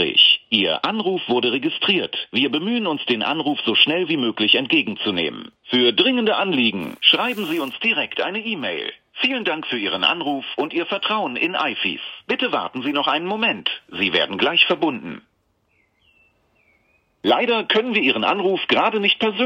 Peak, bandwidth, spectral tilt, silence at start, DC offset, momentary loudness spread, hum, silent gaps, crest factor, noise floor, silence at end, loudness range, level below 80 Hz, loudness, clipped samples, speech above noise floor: 0 dBFS; 16 kHz; -5 dB/octave; 0 s; under 0.1%; 9 LU; none; none; 20 dB; -65 dBFS; 0 s; 4 LU; -70 dBFS; -19 LUFS; under 0.1%; 45 dB